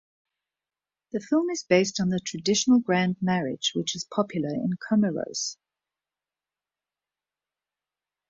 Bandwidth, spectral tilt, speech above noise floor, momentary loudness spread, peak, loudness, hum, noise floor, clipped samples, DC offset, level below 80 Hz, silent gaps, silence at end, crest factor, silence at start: 7.8 kHz; -4.5 dB/octave; over 65 dB; 9 LU; -6 dBFS; -26 LUFS; none; under -90 dBFS; under 0.1%; under 0.1%; -68 dBFS; none; 2.75 s; 20 dB; 1.15 s